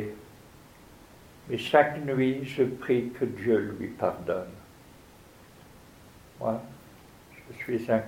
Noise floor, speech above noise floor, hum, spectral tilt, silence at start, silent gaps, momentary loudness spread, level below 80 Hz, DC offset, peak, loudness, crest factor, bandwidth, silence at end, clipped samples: -53 dBFS; 25 dB; none; -6.5 dB/octave; 0 s; none; 24 LU; -60 dBFS; under 0.1%; -6 dBFS; -28 LUFS; 24 dB; 16.5 kHz; 0 s; under 0.1%